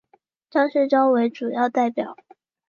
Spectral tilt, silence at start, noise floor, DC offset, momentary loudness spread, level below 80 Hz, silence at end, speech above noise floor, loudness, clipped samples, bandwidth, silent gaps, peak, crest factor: -6 dB/octave; 0.55 s; -62 dBFS; under 0.1%; 9 LU; -78 dBFS; 0.55 s; 42 dB; -21 LUFS; under 0.1%; 7 kHz; none; -6 dBFS; 16 dB